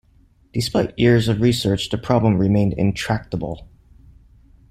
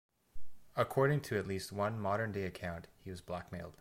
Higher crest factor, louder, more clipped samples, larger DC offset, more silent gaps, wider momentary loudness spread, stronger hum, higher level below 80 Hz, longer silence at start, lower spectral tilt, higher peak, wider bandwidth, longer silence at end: about the same, 18 dB vs 20 dB; first, -19 LUFS vs -37 LUFS; neither; neither; neither; second, 11 LU vs 15 LU; neither; first, -42 dBFS vs -60 dBFS; first, 0.55 s vs 0.1 s; about the same, -6.5 dB/octave vs -6.5 dB/octave; first, -2 dBFS vs -18 dBFS; second, 14.5 kHz vs 16.5 kHz; first, 1.05 s vs 0 s